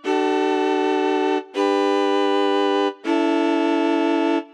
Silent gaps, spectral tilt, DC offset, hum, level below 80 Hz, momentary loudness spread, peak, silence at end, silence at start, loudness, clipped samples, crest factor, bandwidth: none; -2.5 dB/octave; under 0.1%; none; -86 dBFS; 2 LU; -10 dBFS; 0.1 s; 0.05 s; -20 LUFS; under 0.1%; 10 dB; 10 kHz